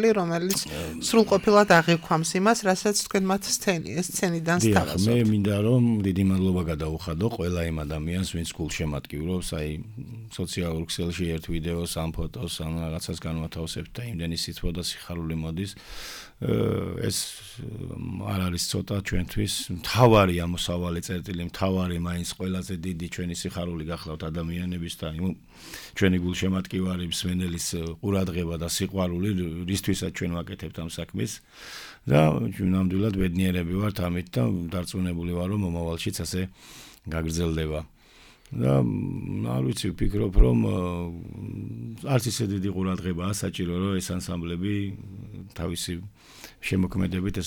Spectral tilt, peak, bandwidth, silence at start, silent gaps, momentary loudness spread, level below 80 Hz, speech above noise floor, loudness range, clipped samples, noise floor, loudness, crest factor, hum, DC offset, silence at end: -5.5 dB/octave; -6 dBFS; 19.5 kHz; 0 s; none; 13 LU; -38 dBFS; 28 dB; 7 LU; under 0.1%; -54 dBFS; -27 LUFS; 20 dB; none; under 0.1%; 0 s